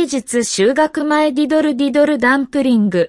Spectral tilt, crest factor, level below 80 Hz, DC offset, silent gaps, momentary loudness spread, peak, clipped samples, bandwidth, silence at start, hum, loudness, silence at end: -4.5 dB/octave; 12 dB; -54 dBFS; under 0.1%; none; 3 LU; -2 dBFS; under 0.1%; 12 kHz; 0 s; none; -15 LUFS; 0 s